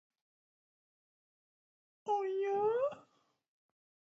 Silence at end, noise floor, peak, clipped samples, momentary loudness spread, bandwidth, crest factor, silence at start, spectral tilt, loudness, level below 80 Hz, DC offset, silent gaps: 1.15 s; -72 dBFS; -24 dBFS; under 0.1%; 13 LU; 7.6 kHz; 16 dB; 2.05 s; -4 dB/octave; -35 LUFS; under -90 dBFS; under 0.1%; none